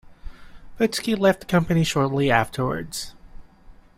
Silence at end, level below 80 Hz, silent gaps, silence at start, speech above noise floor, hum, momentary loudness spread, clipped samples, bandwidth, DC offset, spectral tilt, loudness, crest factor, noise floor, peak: 0.25 s; -44 dBFS; none; 0.05 s; 26 dB; none; 11 LU; under 0.1%; 16 kHz; under 0.1%; -5.5 dB/octave; -22 LUFS; 20 dB; -48 dBFS; -2 dBFS